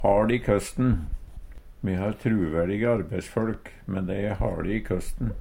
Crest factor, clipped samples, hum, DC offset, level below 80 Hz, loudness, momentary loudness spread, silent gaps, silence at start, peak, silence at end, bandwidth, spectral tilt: 18 dB; under 0.1%; none; under 0.1%; -36 dBFS; -27 LUFS; 10 LU; none; 0 s; -8 dBFS; 0 s; 16.5 kHz; -7.5 dB/octave